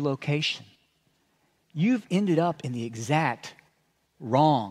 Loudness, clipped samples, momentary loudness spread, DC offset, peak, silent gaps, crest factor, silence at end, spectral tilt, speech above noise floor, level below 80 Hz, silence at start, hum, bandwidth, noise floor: -26 LUFS; under 0.1%; 15 LU; under 0.1%; -8 dBFS; none; 18 dB; 0 s; -6 dB/octave; 45 dB; -74 dBFS; 0 s; none; 12.5 kHz; -70 dBFS